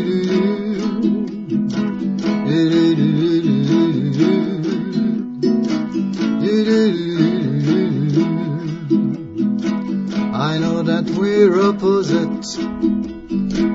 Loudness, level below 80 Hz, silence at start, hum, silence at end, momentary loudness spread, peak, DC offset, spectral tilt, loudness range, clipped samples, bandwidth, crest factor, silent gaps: -18 LUFS; -48 dBFS; 0 s; none; 0 s; 7 LU; -2 dBFS; under 0.1%; -7.5 dB/octave; 2 LU; under 0.1%; 7.8 kHz; 16 dB; none